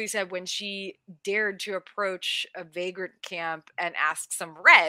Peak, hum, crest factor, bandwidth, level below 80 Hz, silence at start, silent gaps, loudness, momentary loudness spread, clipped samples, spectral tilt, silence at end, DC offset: -2 dBFS; none; 26 dB; 16 kHz; -86 dBFS; 0 s; none; -28 LUFS; 8 LU; under 0.1%; -1 dB/octave; 0 s; under 0.1%